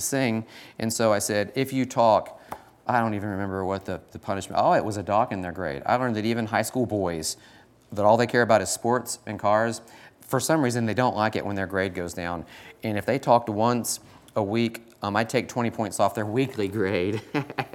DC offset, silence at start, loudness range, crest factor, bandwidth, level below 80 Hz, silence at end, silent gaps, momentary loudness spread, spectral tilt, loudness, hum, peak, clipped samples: under 0.1%; 0 s; 2 LU; 20 dB; 18 kHz; -64 dBFS; 0.05 s; none; 11 LU; -5 dB/octave; -25 LUFS; none; -6 dBFS; under 0.1%